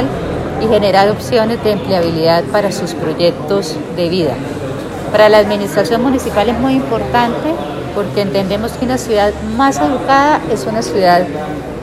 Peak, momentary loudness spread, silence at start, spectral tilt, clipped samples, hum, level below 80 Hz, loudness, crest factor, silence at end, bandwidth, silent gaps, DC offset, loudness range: 0 dBFS; 9 LU; 0 s; -5.5 dB/octave; under 0.1%; none; -36 dBFS; -14 LUFS; 14 dB; 0 s; 15 kHz; none; under 0.1%; 2 LU